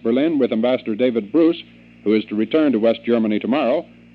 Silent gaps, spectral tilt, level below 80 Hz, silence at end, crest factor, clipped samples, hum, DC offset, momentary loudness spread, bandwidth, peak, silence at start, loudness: none; -9 dB/octave; -62 dBFS; 0.3 s; 14 dB; under 0.1%; none; under 0.1%; 4 LU; 5.2 kHz; -4 dBFS; 0.05 s; -19 LUFS